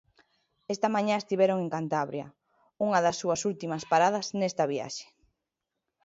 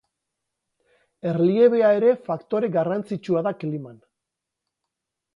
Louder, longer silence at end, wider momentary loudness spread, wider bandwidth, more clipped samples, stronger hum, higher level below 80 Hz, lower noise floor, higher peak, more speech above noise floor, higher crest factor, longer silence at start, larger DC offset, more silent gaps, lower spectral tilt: second, -28 LUFS vs -22 LUFS; second, 1 s vs 1.4 s; about the same, 13 LU vs 14 LU; first, 8 kHz vs 6.8 kHz; neither; neither; about the same, -72 dBFS vs -72 dBFS; about the same, -86 dBFS vs -84 dBFS; second, -10 dBFS vs -6 dBFS; second, 58 dB vs 63 dB; about the same, 20 dB vs 18 dB; second, 0.7 s vs 1.25 s; neither; neither; second, -4.5 dB/octave vs -9 dB/octave